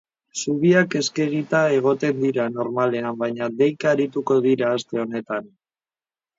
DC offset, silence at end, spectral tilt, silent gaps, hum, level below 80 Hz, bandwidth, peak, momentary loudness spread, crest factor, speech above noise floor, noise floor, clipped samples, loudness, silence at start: under 0.1%; 0.9 s; -5.5 dB/octave; none; none; -68 dBFS; 7.8 kHz; -4 dBFS; 9 LU; 18 dB; over 69 dB; under -90 dBFS; under 0.1%; -21 LUFS; 0.35 s